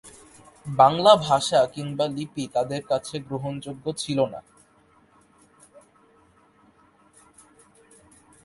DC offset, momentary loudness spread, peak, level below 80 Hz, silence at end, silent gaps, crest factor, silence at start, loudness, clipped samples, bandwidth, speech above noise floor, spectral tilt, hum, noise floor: under 0.1%; 15 LU; -2 dBFS; -62 dBFS; 4.05 s; none; 24 dB; 0.05 s; -23 LUFS; under 0.1%; 11.5 kHz; 36 dB; -5 dB/octave; none; -59 dBFS